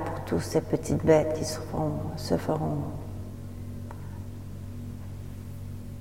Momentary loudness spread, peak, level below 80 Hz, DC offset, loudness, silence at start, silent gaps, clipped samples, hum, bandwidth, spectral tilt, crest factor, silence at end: 17 LU; -8 dBFS; -46 dBFS; 0.4%; -30 LUFS; 0 s; none; under 0.1%; none; 16.5 kHz; -6.5 dB/octave; 22 dB; 0 s